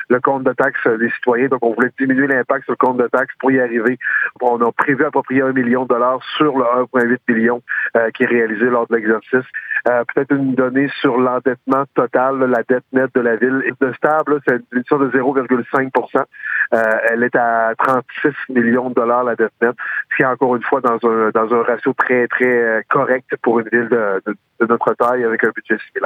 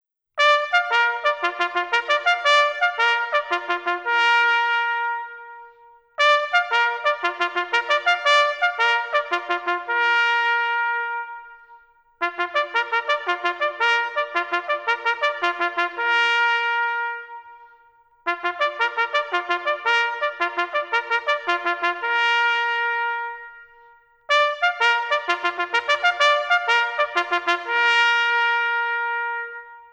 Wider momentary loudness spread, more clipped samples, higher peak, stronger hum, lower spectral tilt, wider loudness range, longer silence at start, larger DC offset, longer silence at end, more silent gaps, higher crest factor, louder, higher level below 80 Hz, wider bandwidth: second, 3 LU vs 8 LU; neither; about the same, -2 dBFS vs -4 dBFS; neither; first, -8 dB/octave vs 0.5 dB/octave; second, 1 LU vs 4 LU; second, 0 s vs 0.35 s; neither; about the same, 0 s vs 0.05 s; neither; about the same, 14 dB vs 18 dB; first, -16 LUFS vs -20 LUFS; about the same, -68 dBFS vs -72 dBFS; second, 4.9 kHz vs 10 kHz